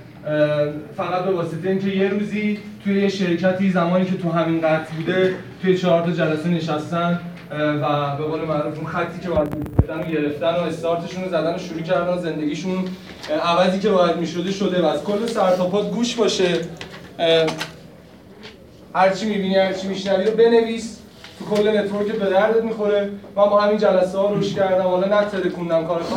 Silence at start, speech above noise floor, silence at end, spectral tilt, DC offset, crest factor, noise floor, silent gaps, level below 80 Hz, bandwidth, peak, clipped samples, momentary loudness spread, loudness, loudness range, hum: 0 s; 24 dB; 0 s; -6 dB/octave; under 0.1%; 20 dB; -44 dBFS; none; -46 dBFS; 16 kHz; -2 dBFS; under 0.1%; 8 LU; -20 LUFS; 4 LU; none